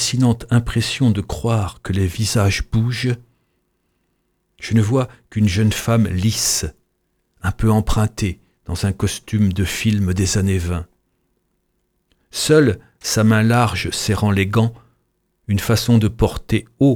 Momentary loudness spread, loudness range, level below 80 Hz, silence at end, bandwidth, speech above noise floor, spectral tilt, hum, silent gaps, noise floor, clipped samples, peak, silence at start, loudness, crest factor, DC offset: 10 LU; 4 LU; -34 dBFS; 0 s; 18 kHz; 51 dB; -5.5 dB/octave; none; none; -68 dBFS; under 0.1%; -2 dBFS; 0 s; -18 LUFS; 16 dB; under 0.1%